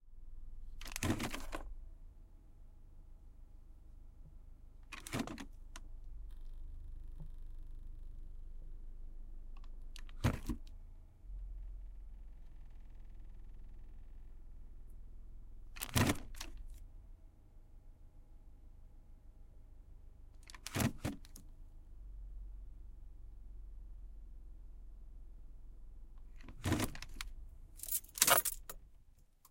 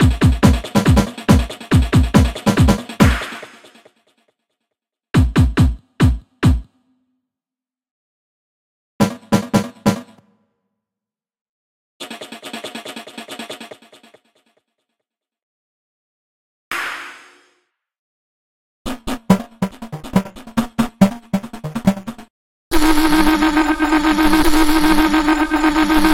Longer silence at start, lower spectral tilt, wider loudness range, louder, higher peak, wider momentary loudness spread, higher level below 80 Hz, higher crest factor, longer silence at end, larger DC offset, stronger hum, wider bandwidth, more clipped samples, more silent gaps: about the same, 0 s vs 0 s; second, -3.5 dB/octave vs -6 dB/octave; about the same, 16 LU vs 18 LU; second, -38 LUFS vs -16 LUFS; second, -10 dBFS vs 0 dBFS; first, 24 LU vs 17 LU; second, -50 dBFS vs -26 dBFS; first, 34 dB vs 18 dB; about the same, 0 s vs 0 s; neither; neither; about the same, 16.5 kHz vs 16.5 kHz; neither; second, none vs 7.91-8.99 s, 11.41-12.00 s, 15.43-16.71 s, 17.99-18.85 s, 22.30-22.71 s